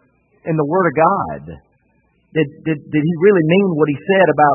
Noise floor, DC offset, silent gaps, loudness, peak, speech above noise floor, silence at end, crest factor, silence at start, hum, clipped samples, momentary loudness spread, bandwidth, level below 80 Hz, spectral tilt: -60 dBFS; under 0.1%; none; -16 LUFS; 0 dBFS; 45 dB; 0 s; 16 dB; 0.45 s; none; under 0.1%; 11 LU; 3.1 kHz; -54 dBFS; -12.5 dB/octave